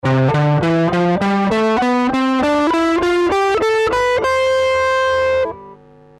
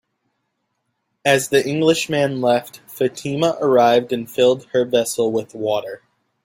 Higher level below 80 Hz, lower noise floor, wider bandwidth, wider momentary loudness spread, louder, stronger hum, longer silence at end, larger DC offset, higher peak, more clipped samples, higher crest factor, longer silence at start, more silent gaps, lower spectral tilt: first, -44 dBFS vs -62 dBFS; second, -42 dBFS vs -73 dBFS; second, 13 kHz vs 16.5 kHz; second, 1 LU vs 8 LU; first, -15 LUFS vs -18 LUFS; neither; about the same, 0.45 s vs 0.45 s; neither; second, -10 dBFS vs -2 dBFS; neither; second, 6 dB vs 18 dB; second, 0.05 s vs 1.25 s; neither; first, -6.5 dB/octave vs -4.5 dB/octave